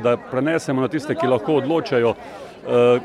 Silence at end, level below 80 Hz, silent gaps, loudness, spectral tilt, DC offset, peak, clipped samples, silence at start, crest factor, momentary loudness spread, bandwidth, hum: 0 s; -60 dBFS; none; -20 LUFS; -6.5 dB/octave; under 0.1%; -4 dBFS; under 0.1%; 0 s; 14 dB; 8 LU; 11.5 kHz; none